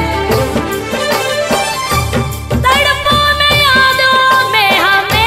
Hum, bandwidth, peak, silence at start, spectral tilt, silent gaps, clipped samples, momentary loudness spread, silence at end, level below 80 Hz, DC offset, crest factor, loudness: none; 16.5 kHz; 0 dBFS; 0 s; -3.5 dB/octave; none; under 0.1%; 8 LU; 0 s; -28 dBFS; 0.2%; 12 dB; -10 LUFS